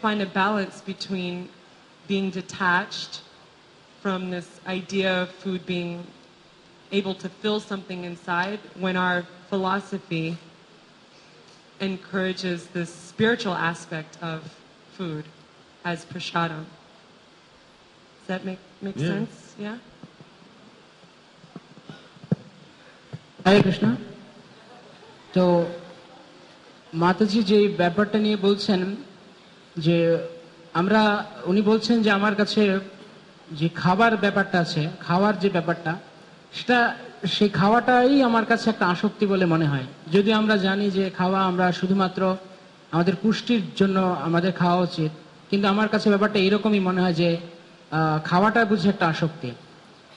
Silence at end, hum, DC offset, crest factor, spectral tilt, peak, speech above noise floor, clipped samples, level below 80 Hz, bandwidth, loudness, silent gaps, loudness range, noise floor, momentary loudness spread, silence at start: 0.55 s; none; under 0.1%; 18 dB; -6.5 dB/octave; -6 dBFS; 30 dB; under 0.1%; -62 dBFS; 10 kHz; -23 LUFS; none; 12 LU; -53 dBFS; 15 LU; 0 s